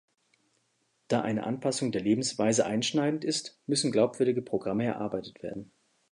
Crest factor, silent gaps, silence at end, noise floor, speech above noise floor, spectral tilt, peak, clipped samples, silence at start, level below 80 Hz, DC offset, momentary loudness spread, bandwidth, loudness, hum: 18 dB; none; 0.5 s; -74 dBFS; 45 dB; -4.5 dB/octave; -12 dBFS; under 0.1%; 1.1 s; -68 dBFS; under 0.1%; 9 LU; 11.5 kHz; -29 LUFS; none